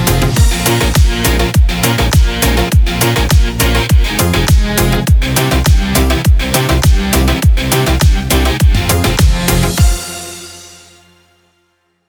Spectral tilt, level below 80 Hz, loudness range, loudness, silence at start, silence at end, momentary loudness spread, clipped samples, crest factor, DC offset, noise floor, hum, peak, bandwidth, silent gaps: -4.5 dB/octave; -14 dBFS; 2 LU; -12 LUFS; 0 s; 1.4 s; 2 LU; under 0.1%; 10 dB; under 0.1%; -60 dBFS; none; 0 dBFS; over 20 kHz; none